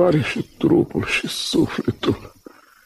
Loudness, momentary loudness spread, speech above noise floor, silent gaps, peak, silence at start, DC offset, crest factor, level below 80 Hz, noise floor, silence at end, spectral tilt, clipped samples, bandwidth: -21 LUFS; 6 LU; 26 dB; none; -4 dBFS; 0 s; under 0.1%; 16 dB; -48 dBFS; -47 dBFS; 0.55 s; -5.5 dB/octave; under 0.1%; 13.5 kHz